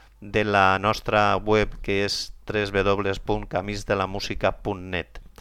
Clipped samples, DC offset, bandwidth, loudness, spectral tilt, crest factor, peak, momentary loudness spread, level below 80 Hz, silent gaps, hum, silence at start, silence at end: under 0.1%; under 0.1%; 15 kHz; -24 LUFS; -5 dB/octave; 20 dB; -4 dBFS; 9 LU; -40 dBFS; none; none; 0.2 s; 0.1 s